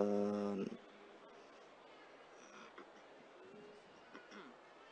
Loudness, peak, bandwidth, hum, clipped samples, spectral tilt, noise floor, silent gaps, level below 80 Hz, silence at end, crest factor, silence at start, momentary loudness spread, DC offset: -45 LUFS; -22 dBFS; 9.2 kHz; none; under 0.1%; -7 dB/octave; -61 dBFS; none; -88 dBFS; 0 s; 24 dB; 0 s; 20 LU; under 0.1%